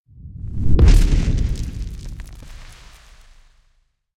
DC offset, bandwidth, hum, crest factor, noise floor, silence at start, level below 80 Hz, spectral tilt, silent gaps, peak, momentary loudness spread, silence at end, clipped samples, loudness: under 0.1%; 11 kHz; none; 18 dB; -62 dBFS; 0.25 s; -20 dBFS; -6.5 dB/octave; none; 0 dBFS; 26 LU; 1.45 s; under 0.1%; -20 LUFS